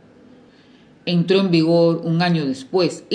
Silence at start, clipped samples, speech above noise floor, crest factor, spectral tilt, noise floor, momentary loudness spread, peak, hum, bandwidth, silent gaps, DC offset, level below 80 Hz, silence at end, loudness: 1.05 s; under 0.1%; 32 dB; 16 dB; -7 dB/octave; -49 dBFS; 6 LU; -4 dBFS; none; 9.8 kHz; none; under 0.1%; -66 dBFS; 0 s; -18 LUFS